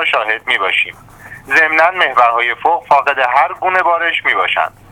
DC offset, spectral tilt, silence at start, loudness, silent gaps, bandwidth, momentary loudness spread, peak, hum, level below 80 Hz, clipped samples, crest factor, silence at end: under 0.1%; -2.5 dB/octave; 0 s; -13 LUFS; none; 16.5 kHz; 4 LU; 0 dBFS; none; -54 dBFS; under 0.1%; 14 dB; 0.2 s